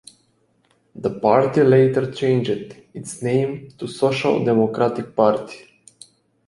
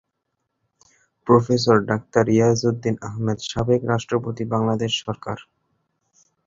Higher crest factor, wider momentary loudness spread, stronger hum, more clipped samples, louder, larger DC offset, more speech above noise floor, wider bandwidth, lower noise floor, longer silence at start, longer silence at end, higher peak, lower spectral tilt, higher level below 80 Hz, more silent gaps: about the same, 18 dB vs 22 dB; first, 17 LU vs 11 LU; neither; neither; about the same, -19 LUFS vs -21 LUFS; neither; second, 44 dB vs 56 dB; first, 11.5 kHz vs 7.8 kHz; second, -63 dBFS vs -77 dBFS; second, 0.95 s vs 1.25 s; second, 0.9 s vs 1.05 s; about the same, -2 dBFS vs 0 dBFS; about the same, -7 dB/octave vs -6 dB/octave; second, -60 dBFS vs -52 dBFS; neither